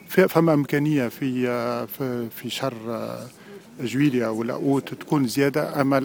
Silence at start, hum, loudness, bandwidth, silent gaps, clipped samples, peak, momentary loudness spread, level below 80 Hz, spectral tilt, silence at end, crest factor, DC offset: 0.05 s; none; -24 LUFS; 19.5 kHz; none; under 0.1%; -4 dBFS; 12 LU; -66 dBFS; -6.5 dB/octave; 0 s; 20 dB; under 0.1%